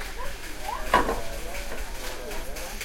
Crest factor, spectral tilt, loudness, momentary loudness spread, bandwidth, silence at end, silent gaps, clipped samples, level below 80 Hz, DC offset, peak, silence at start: 24 dB; -3 dB/octave; -30 LUFS; 12 LU; 16.5 kHz; 0 s; none; under 0.1%; -36 dBFS; under 0.1%; -4 dBFS; 0 s